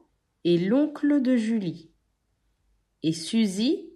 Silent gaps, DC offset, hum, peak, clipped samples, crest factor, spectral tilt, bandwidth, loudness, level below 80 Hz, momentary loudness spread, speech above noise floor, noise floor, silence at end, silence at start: none; under 0.1%; none; -12 dBFS; under 0.1%; 14 dB; -6 dB/octave; 12 kHz; -25 LUFS; -70 dBFS; 9 LU; 49 dB; -72 dBFS; 0.1 s; 0.45 s